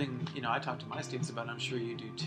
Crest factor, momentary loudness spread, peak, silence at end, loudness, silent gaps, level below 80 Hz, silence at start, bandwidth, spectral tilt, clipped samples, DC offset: 18 dB; 5 LU; -18 dBFS; 0 s; -37 LUFS; none; -76 dBFS; 0 s; 10 kHz; -5 dB/octave; under 0.1%; under 0.1%